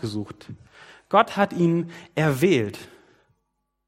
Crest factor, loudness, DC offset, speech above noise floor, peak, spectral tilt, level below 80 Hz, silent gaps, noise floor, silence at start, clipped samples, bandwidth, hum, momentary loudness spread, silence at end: 22 dB; -23 LUFS; under 0.1%; 53 dB; -4 dBFS; -6.5 dB/octave; -64 dBFS; none; -76 dBFS; 0 s; under 0.1%; 16 kHz; none; 20 LU; 1 s